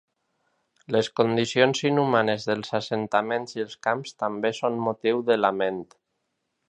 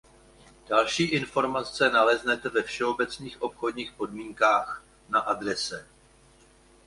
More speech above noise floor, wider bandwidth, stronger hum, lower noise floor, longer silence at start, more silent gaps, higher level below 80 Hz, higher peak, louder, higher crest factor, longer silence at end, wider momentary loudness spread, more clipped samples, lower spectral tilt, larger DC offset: first, 53 dB vs 31 dB; second, 10 kHz vs 11.5 kHz; neither; first, -78 dBFS vs -58 dBFS; first, 0.9 s vs 0.7 s; neither; second, -70 dBFS vs -60 dBFS; first, -2 dBFS vs -8 dBFS; about the same, -25 LUFS vs -26 LUFS; about the same, 22 dB vs 20 dB; second, 0.85 s vs 1.05 s; second, 8 LU vs 12 LU; neither; first, -5 dB/octave vs -3.5 dB/octave; neither